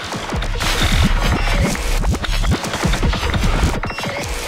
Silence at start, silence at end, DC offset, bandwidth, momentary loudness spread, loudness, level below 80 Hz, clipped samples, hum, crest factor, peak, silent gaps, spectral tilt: 0 s; 0 s; under 0.1%; 16 kHz; 6 LU; -19 LUFS; -20 dBFS; under 0.1%; none; 14 dB; -2 dBFS; none; -4.5 dB/octave